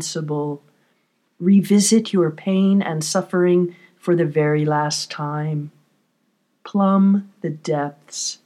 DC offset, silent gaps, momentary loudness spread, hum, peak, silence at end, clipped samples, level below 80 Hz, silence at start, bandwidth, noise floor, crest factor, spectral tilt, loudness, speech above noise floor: under 0.1%; none; 13 LU; none; -4 dBFS; 0.1 s; under 0.1%; -76 dBFS; 0 s; 14 kHz; -67 dBFS; 16 dB; -5.5 dB/octave; -20 LUFS; 48 dB